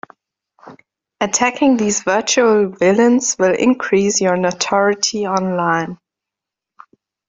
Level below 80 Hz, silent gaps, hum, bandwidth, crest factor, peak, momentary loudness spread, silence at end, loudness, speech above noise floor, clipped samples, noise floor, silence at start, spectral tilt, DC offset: -58 dBFS; none; none; 8 kHz; 16 dB; -2 dBFS; 5 LU; 1.35 s; -15 LUFS; 69 dB; under 0.1%; -85 dBFS; 0.65 s; -3.5 dB/octave; under 0.1%